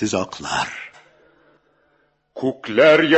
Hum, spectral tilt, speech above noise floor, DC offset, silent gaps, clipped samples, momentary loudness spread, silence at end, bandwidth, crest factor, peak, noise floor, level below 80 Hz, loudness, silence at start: none; -4 dB/octave; 46 dB; under 0.1%; none; under 0.1%; 23 LU; 0 s; 8.4 kHz; 18 dB; -2 dBFS; -63 dBFS; -56 dBFS; -19 LUFS; 0 s